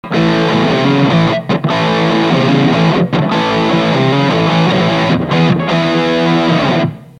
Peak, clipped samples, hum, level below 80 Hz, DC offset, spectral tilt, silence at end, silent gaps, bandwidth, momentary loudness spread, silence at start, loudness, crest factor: 0 dBFS; under 0.1%; none; -42 dBFS; under 0.1%; -6.5 dB/octave; 0.15 s; none; 9.8 kHz; 2 LU; 0.05 s; -12 LUFS; 12 dB